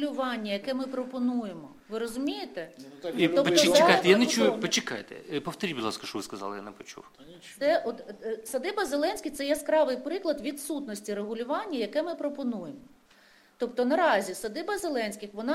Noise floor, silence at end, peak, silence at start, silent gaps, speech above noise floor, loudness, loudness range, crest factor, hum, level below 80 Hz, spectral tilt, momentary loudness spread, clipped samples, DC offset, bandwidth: -59 dBFS; 0 s; -4 dBFS; 0 s; none; 31 dB; -28 LUFS; 9 LU; 26 dB; none; -68 dBFS; -3.5 dB/octave; 17 LU; under 0.1%; under 0.1%; 16 kHz